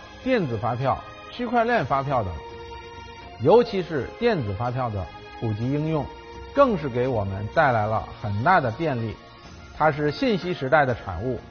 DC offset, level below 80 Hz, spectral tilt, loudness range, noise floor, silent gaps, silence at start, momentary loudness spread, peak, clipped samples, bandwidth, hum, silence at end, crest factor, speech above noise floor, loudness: under 0.1%; -46 dBFS; -5.5 dB/octave; 2 LU; -43 dBFS; none; 0 s; 18 LU; -6 dBFS; under 0.1%; 6.6 kHz; none; 0 s; 18 dB; 20 dB; -24 LUFS